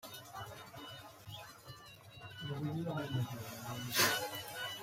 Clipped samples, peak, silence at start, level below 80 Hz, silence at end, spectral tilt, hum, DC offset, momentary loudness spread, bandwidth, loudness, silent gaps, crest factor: under 0.1%; -16 dBFS; 0.05 s; -70 dBFS; 0 s; -3 dB/octave; none; under 0.1%; 21 LU; 16 kHz; -38 LUFS; none; 24 dB